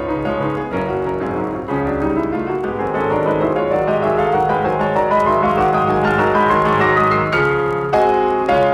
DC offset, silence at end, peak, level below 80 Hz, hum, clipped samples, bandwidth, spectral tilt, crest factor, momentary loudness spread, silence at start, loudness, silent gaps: under 0.1%; 0 s; -4 dBFS; -40 dBFS; none; under 0.1%; 12.5 kHz; -7.5 dB/octave; 12 dB; 7 LU; 0 s; -17 LUFS; none